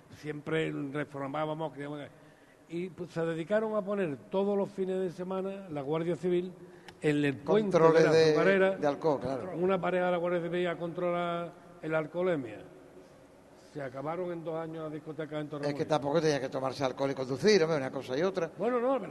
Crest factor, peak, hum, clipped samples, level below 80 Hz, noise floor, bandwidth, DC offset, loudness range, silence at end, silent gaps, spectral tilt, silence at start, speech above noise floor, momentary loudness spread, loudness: 22 dB; -8 dBFS; none; under 0.1%; -70 dBFS; -56 dBFS; 12 kHz; under 0.1%; 10 LU; 0 s; none; -6 dB/octave; 0.1 s; 26 dB; 15 LU; -31 LUFS